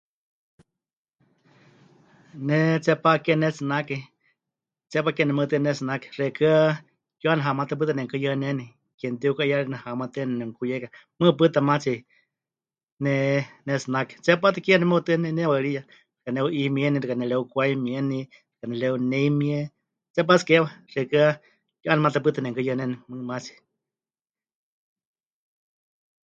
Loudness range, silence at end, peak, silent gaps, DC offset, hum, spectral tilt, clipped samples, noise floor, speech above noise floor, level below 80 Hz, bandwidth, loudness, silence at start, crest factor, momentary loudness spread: 5 LU; 2.75 s; -2 dBFS; 8.94-8.98 s, 12.92-12.97 s, 20.10-20.14 s; under 0.1%; none; -6.5 dB/octave; under 0.1%; under -90 dBFS; over 67 dB; -70 dBFS; 7.8 kHz; -24 LUFS; 2.35 s; 22 dB; 13 LU